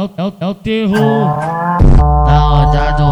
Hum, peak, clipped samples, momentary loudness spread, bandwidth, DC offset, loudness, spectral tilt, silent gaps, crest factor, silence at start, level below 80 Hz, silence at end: none; 0 dBFS; 0.9%; 9 LU; 10.5 kHz; under 0.1%; -12 LUFS; -8 dB/octave; none; 10 dB; 0 s; -14 dBFS; 0 s